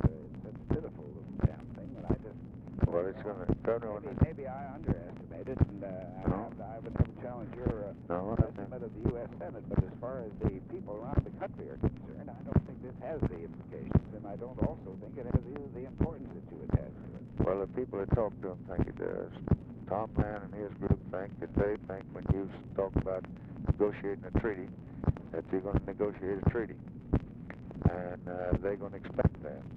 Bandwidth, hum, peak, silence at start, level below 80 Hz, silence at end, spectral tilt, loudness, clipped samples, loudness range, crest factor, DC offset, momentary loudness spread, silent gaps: 4.4 kHz; none; -12 dBFS; 0 s; -44 dBFS; 0 s; -11.5 dB/octave; -36 LUFS; under 0.1%; 2 LU; 22 dB; under 0.1%; 12 LU; none